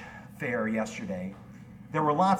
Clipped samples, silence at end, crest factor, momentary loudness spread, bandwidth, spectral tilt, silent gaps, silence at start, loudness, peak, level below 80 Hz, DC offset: under 0.1%; 0 s; 18 dB; 20 LU; 14 kHz; -6.5 dB/octave; none; 0 s; -31 LUFS; -12 dBFS; -62 dBFS; under 0.1%